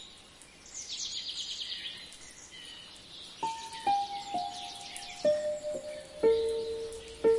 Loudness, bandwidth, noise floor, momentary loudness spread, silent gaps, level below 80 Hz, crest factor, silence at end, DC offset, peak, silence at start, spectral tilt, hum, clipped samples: -34 LUFS; 11.5 kHz; -54 dBFS; 16 LU; none; -64 dBFS; 18 dB; 0 s; under 0.1%; -16 dBFS; 0 s; -2 dB/octave; none; under 0.1%